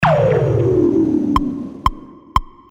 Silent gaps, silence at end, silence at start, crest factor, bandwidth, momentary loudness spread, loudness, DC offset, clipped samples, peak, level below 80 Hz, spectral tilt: none; 0.25 s; 0 s; 16 dB; 16 kHz; 8 LU; -17 LUFS; under 0.1%; under 0.1%; 0 dBFS; -30 dBFS; -8 dB/octave